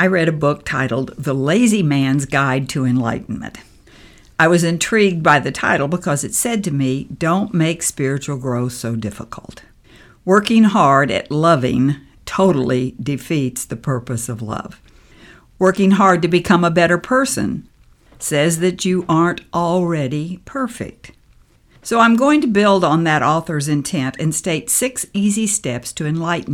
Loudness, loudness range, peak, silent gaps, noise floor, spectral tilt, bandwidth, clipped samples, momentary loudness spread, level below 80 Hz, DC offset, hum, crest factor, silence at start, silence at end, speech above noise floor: -17 LUFS; 5 LU; 0 dBFS; none; -51 dBFS; -5 dB/octave; 17.5 kHz; under 0.1%; 12 LU; -48 dBFS; under 0.1%; none; 16 dB; 0 s; 0 s; 34 dB